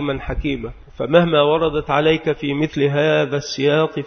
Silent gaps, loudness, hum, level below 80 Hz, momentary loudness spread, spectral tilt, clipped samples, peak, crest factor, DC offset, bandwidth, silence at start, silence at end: none; -18 LUFS; none; -36 dBFS; 9 LU; -6 dB/octave; under 0.1%; 0 dBFS; 18 dB; under 0.1%; 6.6 kHz; 0 s; 0 s